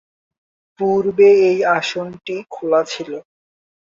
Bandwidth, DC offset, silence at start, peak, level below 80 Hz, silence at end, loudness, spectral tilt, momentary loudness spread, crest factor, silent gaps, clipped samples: 7.6 kHz; under 0.1%; 0.8 s; -2 dBFS; -62 dBFS; 0.65 s; -16 LUFS; -5 dB/octave; 16 LU; 16 dB; none; under 0.1%